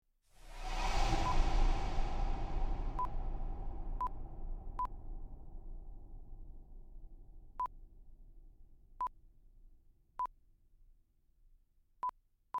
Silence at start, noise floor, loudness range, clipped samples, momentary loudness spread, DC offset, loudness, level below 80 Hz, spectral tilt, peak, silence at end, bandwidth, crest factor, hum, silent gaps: 0.45 s; -69 dBFS; 12 LU; under 0.1%; 22 LU; under 0.1%; -41 LUFS; -40 dBFS; -5 dB/octave; -18 dBFS; 0 s; 8.6 kHz; 20 dB; none; none